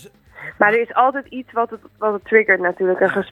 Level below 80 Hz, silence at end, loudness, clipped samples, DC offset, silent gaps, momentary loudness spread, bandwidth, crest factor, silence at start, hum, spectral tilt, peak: -60 dBFS; 0.05 s; -18 LUFS; under 0.1%; under 0.1%; none; 12 LU; 9.2 kHz; 18 dB; 0.05 s; none; -7 dB/octave; 0 dBFS